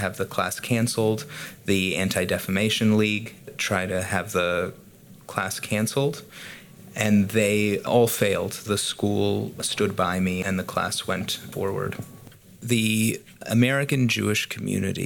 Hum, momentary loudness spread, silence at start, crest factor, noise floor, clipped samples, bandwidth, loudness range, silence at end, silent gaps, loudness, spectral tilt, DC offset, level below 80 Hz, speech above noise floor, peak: none; 12 LU; 0 s; 20 dB; -47 dBFS; under 0.1%; 19 kHz; 3 LU; 0 s; none; -24 LUFS; -4.5 dB/octave; under 0.1%; -58 dBFS; 22 dB; -4 dBFS